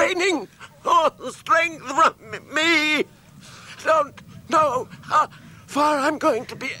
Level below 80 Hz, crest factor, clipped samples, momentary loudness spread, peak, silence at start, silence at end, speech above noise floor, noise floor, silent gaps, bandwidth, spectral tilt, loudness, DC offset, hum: -62 dBFS; 16 dB; under 0.1%; 12 LU; -6 dBFS; 0 s; 0 s; 23 dB; -45 dBFS; none; 16.5 kHz; -3 dB/octave; -21 LUFS; under 0.1%; none